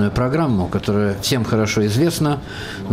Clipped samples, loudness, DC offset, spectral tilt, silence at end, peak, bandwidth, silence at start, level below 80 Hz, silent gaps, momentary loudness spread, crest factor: under 0.1%; -19 LUFS; under 0.1%; -5.5 dB/octave; 0 s; -8 dBFS; 16 kHz; 0 s; -40 dBFS; none; 6 LU; 10 dB